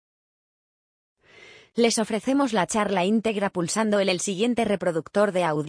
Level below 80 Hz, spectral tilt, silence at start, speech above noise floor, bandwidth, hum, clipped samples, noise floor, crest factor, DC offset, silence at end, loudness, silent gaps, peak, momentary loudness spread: -64 dBFS; -4.5 dB/octave; 1.75 s; 27 dB; 10.5 kHz; none; under 0.1%; -50 dBFS; 16 dB; under 0.1%; 0 s; -24 LUFS; none; -8 dBFS; 3 LU